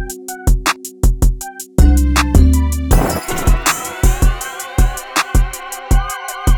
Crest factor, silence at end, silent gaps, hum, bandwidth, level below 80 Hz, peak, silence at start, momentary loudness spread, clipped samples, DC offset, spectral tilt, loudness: 14 dB; 0 s; none; none; over 20 kHz; -14 dBFS; 0 dBFS; 0 s; 9 LU; under 0.1%; under 0.1%; -4.5 dB/octave; -16 LUFS